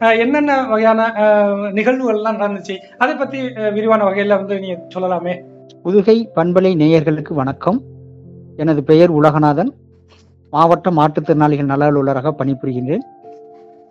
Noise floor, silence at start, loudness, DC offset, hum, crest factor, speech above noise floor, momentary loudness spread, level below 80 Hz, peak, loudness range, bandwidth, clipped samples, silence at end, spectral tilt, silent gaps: -48 dBFS; 0 s; -15 LUFS; under 0.1%; none; 16 dB; 33 dB; 10 LU; -54 dBFS; 0 dBFS; 3 LU; 7.4 kHz; under 0.1%; 0.45 s; -8 dB/octave; none